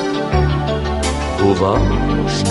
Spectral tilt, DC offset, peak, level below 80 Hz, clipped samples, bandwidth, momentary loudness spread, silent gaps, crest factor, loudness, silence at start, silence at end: -6 dB/octave; under 0.1%; -2 dBFS; -22 dBFS; under 0.1%; 11.5 kHz; 4 LU; none; 14 dB; -17 LUFS; 0 s; 0 s